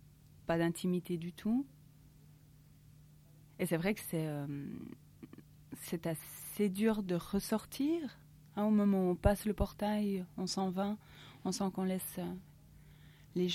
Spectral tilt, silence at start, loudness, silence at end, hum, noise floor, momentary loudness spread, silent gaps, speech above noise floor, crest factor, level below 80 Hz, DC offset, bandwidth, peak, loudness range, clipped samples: -6 dB/octave; 0.45 s; -36 LUFS; 0 s; none; -61 dBFS; 16 LU; none; 26 dB; 22 dB; -54 dBFS; under 0.1%; 16.5 kHz; -14 dBFS; 7 LU; under 0.1%